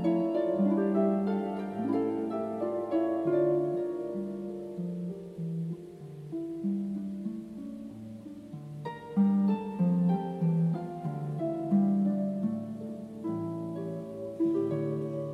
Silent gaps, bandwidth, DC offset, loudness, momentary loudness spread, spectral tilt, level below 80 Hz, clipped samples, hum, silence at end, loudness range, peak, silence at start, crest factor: none; 5 kHz; under 0.1%; -31 LUFS; 14 LU; -10 dB/octave; -68 dBFS; under 0.1%; none; 0 s; 8 LU; -16 dBFS; 0 s; 16 dB